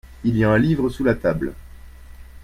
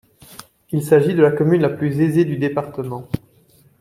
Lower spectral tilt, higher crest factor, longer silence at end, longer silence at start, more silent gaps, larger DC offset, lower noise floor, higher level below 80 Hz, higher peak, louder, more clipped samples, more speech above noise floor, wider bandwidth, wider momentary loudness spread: about the same, -8.5 dB/octave vs -8 dB/octave; about the same, 16 dB vs 18 dB; second, 0.05 s vs 0.65 s; second, 0.05 s vs 0.3 s; neither; neither; second, -40 dBFS vs -54 dBFS; first, -38 dBFS vs -52 dBFS; about the same, -4 dBFS vs -2 dBFS; about the same, -20 LUFS vs -18 LUFS; neither; second, 21 dB vs 37 dB; about the same, 15.5 kHz vs 15.5 kHz; second, 8 LU vs 13 LU